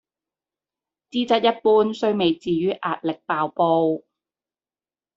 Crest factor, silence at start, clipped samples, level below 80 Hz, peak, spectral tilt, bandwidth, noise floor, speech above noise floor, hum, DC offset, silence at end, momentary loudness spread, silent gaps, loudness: 20 dB; 1.15 s; under 0.1%; -66 dBFS; -4 dBFS; -6.5 dB/octave; 7.8 kHz; under -90 dBFS; over 69 dB; none; under 0.1%; 1.2 s; 8 LU; none; -21 LUFS